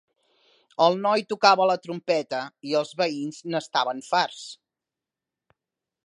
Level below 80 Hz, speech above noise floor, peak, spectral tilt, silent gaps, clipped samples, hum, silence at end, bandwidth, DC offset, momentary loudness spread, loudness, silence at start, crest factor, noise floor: -82 dBFS; 64 dB; -2 dBFS; -4 dB/octave; none; under 0.1%; none; 1.5 s; 11 kHz; under 0.1%; 12 LU; -24 LUFS; 0.8 s; 24 dB; -88 dBFS